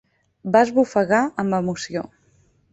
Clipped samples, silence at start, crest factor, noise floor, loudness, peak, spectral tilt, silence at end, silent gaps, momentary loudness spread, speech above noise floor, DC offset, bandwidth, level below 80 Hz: under 0.1%; 0.45 s; 20 dB; -60 dBFS; -20 LUFS; -2 dBFS; -6 dB/octave; 0.65 s; none; 14 LU; 40 dB; under 0.1%; 8.4 kHz; -60 dBFS